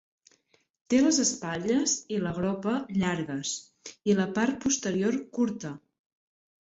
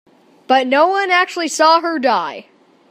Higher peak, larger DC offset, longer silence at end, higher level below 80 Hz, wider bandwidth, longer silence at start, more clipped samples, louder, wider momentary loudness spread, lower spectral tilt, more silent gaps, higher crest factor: second, -12 dBFS vs 0 dBFS; neither; first, 0.9 s vs 0.5 s; first, -62 dBFS vs -78 dBFS; second, 8.4 kHz vs 15.5 kHz; first, 0.9 s vs 0.5 s; neither; second, -28 LUFS vs -14 LUFS; first, 10 LU vs 7 LU; first, -4 dB/octave vs -1.5 dB/octave; neither; about the same, 18 dB vs 16 dB